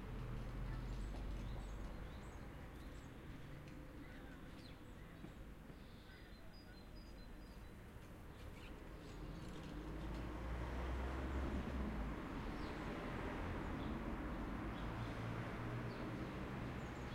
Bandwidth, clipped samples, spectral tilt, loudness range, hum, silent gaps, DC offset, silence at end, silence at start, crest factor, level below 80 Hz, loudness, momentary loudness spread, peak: 16 kHz; under 0.1%; -7 dB/octave; 11 LU; none; none; under 0.1%; 0 s; 0 s; 16 dB; -52 dBFS; -50 LUFS; 12 LU; -32 dBFS